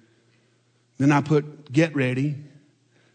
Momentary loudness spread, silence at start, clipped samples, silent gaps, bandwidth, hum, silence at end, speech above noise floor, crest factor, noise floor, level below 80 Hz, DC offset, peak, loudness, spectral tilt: 7 LU; 1 s; under 0.1%; none; 9.2 kHz; none; 0.7 s; 42 dB; 18 dB; -64 dBFS; -68 dBFS; under 0.1%; -8 dBFS; -23 LUFS; -7 dB/octave